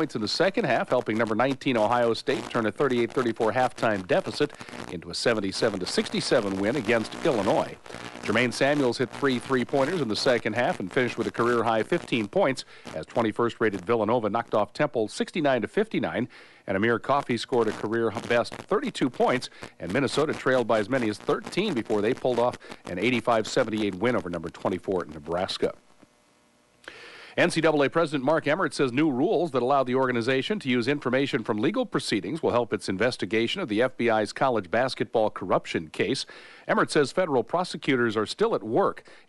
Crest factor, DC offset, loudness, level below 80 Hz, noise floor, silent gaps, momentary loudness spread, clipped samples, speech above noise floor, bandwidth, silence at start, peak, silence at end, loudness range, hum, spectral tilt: 16 dB; under 0.1%; -26 LUFS; -60 dBFS; -62 dBFS; none; 6 LU; under 0.1%; 37 dB; 11.5 kHz; 0 s; -10 dBFS; 0.1 s; 2 LU; none; -5 dB/octave